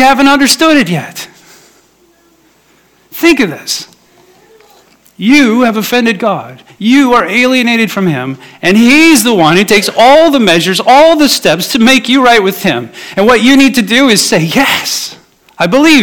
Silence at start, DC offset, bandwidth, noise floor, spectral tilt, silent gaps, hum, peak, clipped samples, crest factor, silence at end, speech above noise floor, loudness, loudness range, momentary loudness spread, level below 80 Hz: 0 s; under 0.1%; 19.5 kHz; -48 dBFS; -3.5 dB/octave; none; none; 0 dBFS; 2%; 8 dB; 0 s; 41 dB; -7 LUFS; 10 LU; 12 LU; -44 dBFS